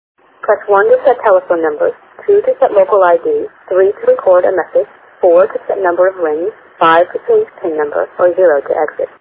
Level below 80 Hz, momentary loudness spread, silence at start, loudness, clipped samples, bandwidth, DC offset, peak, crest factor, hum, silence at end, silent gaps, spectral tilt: -58 dBFS; 8 LU; 0.45 s; -12 LUFS; under 0.1%; 4 kHz; under 0.1%; 0 dBFS; 12 dB; none; 0.15 s; none; -8.5 dB/octave